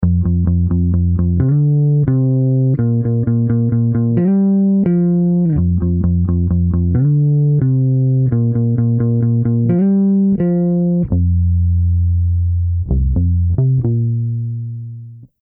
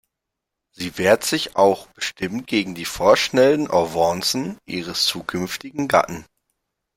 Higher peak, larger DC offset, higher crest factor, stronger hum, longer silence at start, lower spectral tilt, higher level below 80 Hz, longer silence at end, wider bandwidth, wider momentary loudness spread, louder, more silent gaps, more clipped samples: about the same, -2 dBFS vs -2 dBFS; neither; second, 10 dB vs 20 dB; neither; second, 0 s vs 0.8 s; first, -15.5 dB/octave vs -3.5 dB/octave; first, -30 dBFS vs -54 dBFS; second, 0.15 s vs 0.75 s; second, 2.4 kHz vs 16.5 kHz; second, 4 LU vs 12 LU; first, -15 LUFS vs -20 LUFS; neither; neither